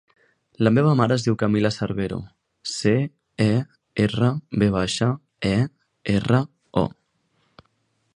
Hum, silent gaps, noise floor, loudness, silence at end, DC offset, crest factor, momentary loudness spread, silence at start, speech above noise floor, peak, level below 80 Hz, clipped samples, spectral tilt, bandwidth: none; none; -69 dBFS; -22 LUFS; 1.25 s; under 0.1%; 22 dB; 10 LU; 0.6 s; 48 dB; -2 dBFS; -48 dBFS; under 0.1%; -6.5 dB/octave; 10.5 kHz